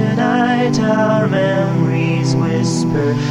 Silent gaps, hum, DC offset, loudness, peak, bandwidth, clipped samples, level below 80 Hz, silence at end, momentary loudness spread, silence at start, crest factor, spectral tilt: none; none; under 0.1%; -15 LUFS; -2 dBFS; 11 kHz; under 0.1%; -46 dBFS; 0 s; 2 LU; 0 s; 12 dB; -6.5 dB/octave